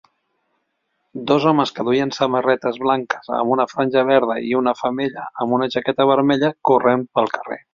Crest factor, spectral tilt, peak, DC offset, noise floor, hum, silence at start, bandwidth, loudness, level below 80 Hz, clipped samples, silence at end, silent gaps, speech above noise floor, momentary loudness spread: 16 dB; -6 dB/octave; -2 dBFS; under 0.1%; -72 dBFS; none; 1.15 s; 7.4 kHz; -19 LUFS; -62 dBFS; under 0.1%; 0.15 s; none; 53 dB; 8 LU